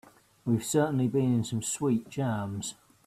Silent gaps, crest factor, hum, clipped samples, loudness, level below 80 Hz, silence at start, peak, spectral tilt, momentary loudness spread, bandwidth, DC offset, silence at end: none; 18 dB; none; under 0.1%; -29 LUFS; -64 dBFS; 0.45 s; -12 dBFS; -6 dB/octave; 10 LU; 15.5 kHz; under 0.1%; 0.35 s